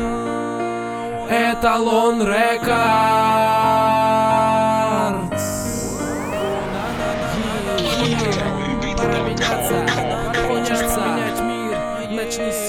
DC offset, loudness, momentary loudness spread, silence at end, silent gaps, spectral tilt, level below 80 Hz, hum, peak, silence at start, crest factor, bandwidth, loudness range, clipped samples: under 0.1%; -19 LUFS; 8 LU; 0 s; none; -4.5 dB/octave; -38 dBFS; none; -4 dBFS; 0 s; 14 dB; 18 kHz; 6 LU; under 0.1%